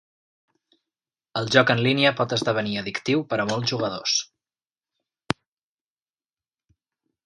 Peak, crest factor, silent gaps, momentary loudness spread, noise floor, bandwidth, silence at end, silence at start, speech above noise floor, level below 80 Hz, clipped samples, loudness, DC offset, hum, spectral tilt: 0 dBFS; 26 dB; none; 12 LU; under -90 dBFS; 11.5 kHz; 3 s; 1.35 s; over 67 dB; -62 dBFS; under 0.1%; -23 LUFS; under 0.1%; none; -4 dB/octave